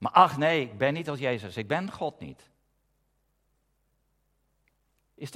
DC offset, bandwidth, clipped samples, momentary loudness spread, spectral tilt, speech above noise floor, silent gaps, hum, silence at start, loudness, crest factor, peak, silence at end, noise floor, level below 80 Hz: under 0.1%; 15 kHz; under 0.1%; 20 LU; -6 dB/octave; 47 dB; none; none; 0 s; -27 LUFS; 26 dB; -4 dBFS; 0 s; -73 dBFS; -70 dBFS